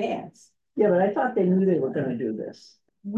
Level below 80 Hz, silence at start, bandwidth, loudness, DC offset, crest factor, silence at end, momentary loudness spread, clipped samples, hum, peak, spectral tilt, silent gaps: -74 dBFS; 0 s; 8 kHz; -24 LUFS; under 0.1%; 16 dB; 0 s; 17 LU; under 0.1%; none; -10 dBFS; -8.5 dB/octave; none